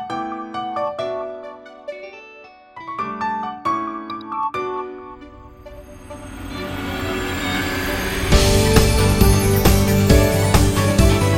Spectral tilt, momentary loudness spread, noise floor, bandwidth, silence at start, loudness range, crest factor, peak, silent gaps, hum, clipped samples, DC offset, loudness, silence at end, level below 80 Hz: -5 dB/octave; 22 LU; -43 dBFS; 16.5 kHz; 0 s; 12 LU; 18 dB; 0 dBFS; none; none; under 0.1%; under 0.1%; -19 LUFS; 0 s; -26 dBFS